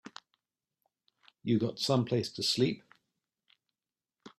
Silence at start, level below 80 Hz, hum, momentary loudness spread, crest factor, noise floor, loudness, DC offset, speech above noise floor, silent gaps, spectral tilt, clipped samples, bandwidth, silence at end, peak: 0.05 s; -72 dBFS; none; 14 LU; 20 dB; under -90 dBFS; -31 LUFS; under 0.1%; over 60 dB; none; -5.5 dB/octave; under 0.1%; 14.5 kHz; 0.1 s; -14 dBFS